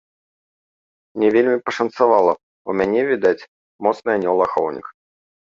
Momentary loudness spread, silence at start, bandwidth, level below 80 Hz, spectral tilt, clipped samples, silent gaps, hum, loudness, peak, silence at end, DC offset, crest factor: 11 LU; 1.15 s; 7.4 kHz; -60 dBFS; -6.5 dB/octave; under 0.1%; 2.43-2.65 s, 3.48-3.79 s; none; -19 LUFS; -2 dBFS; 0.5 s; under 0.1%; 18 dB